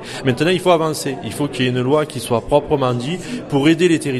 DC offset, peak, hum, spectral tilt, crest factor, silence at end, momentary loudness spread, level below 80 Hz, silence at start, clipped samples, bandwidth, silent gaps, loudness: under 0.1%; 0 dBFS; none; -5.5 dB/octave; 16 dB; 0 s; 9 LU; -46 dBFS; 0 s; under 0.1%; 13 kHz; none; -18 LUFS